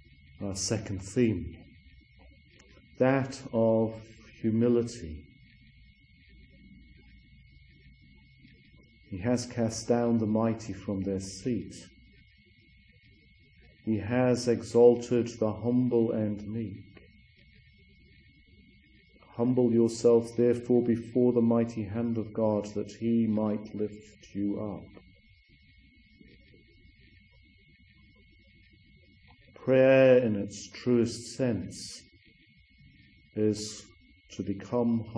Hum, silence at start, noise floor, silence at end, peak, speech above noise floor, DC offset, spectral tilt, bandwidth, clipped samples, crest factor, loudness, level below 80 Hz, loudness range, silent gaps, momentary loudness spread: none; 0.4 s; -61 dBFS; 0 s; -8 dBFS; 33 dB; under 0.1%; -6.5 dB/octave; 10.5 kHz; under 0.1%; 22 dB; -28 LUFS; -60 dBFS; 11 LU; none; 17 LU